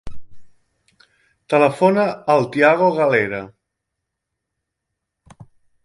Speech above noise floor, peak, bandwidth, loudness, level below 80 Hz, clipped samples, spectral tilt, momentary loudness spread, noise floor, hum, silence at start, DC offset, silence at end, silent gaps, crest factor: 63 dB; -2 dBFS; 11.5 kHz; -16 LUFS; -52 dBFS; under 0.1%; -6.5 dB/octave; 6 LU; -79 dBFS; none; 0.05 s; under 0.1%; 0.4 s; none; 20 dB